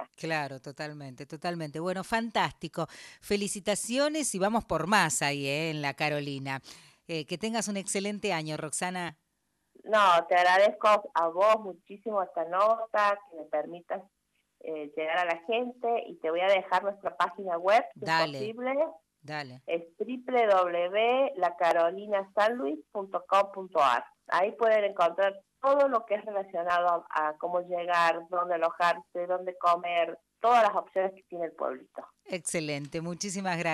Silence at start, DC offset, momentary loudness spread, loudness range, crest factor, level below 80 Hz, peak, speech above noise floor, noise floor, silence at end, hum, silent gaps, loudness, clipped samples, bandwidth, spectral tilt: 0 s; under 0.1%; 13 LU; 6 LU; 20 dB; -68 dBFS; -10 dBFS; 49 dB; -78 dBFS; 0 s; none; none; -29 LUFS; under 0.1%; 13 kHz; -3.5 dB/octave